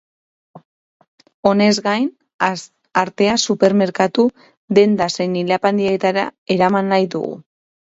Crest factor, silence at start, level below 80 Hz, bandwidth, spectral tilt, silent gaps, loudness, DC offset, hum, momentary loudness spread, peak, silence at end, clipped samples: 18 dB; 0.55 s; -58 dBFS; 8 kHz; -5 dB/octave; 0.65-1.00 s, 1.08-1.18 s, 1.34-1.43 s, 2.34-2.39 s, 4.57-4.68 s, 6.38-6.46 s; -17 LUFS; under 0.1%; none; 7 LU; 0 dBFS; 0.5 s; under 0.1%